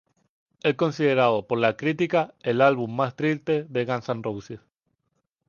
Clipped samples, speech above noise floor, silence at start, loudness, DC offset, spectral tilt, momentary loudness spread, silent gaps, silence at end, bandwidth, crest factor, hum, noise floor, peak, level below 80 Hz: under 0.1%; 53 dB; 0.65 s; -24 LUFS; under 0.1%; -7 dB/octave; 10 LU; none; 0.9 s; 7.2 kHz; 20 dB; none; -76 dBFS; -4 dBFS; -66 dBFS